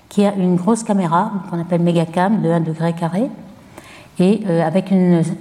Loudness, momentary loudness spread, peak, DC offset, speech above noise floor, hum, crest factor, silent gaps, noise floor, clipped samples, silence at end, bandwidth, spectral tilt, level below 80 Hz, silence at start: -17 LUFS; 7 LU; -2 dBFS; under 0.1%; 24 dB; none; 14 dB; none; -40 dBFS; under 0.1%; 0 s; 11.5 kHz; -7.5 dB/octave; -60 dBFS; 0.1 s